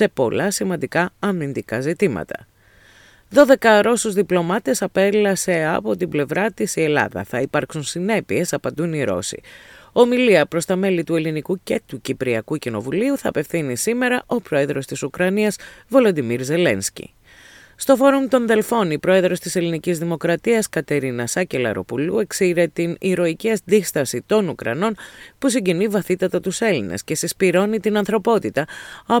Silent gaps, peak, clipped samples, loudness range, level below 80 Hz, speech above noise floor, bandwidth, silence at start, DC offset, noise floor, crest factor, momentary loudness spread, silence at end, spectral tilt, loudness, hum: none; 0 dBFS; under 0.1%; 4 LU; -56 dBFS; 31 dB; 18.5 kHz; 0 s; under 0.1%; -50 dBFS; 20 dB; 9 LU; 0 s; -5 dB/octave; -19 LUFS; none